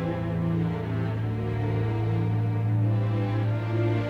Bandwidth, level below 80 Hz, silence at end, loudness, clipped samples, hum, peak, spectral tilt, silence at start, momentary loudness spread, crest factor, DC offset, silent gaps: 4.7 kHz; -46 dBFS; 0 s; -27 LUFS; under 0.1%; none; -16 dBFS; -9.5 dB/octave; 0 s; 4 LU; 10 dB; under 0.1%; none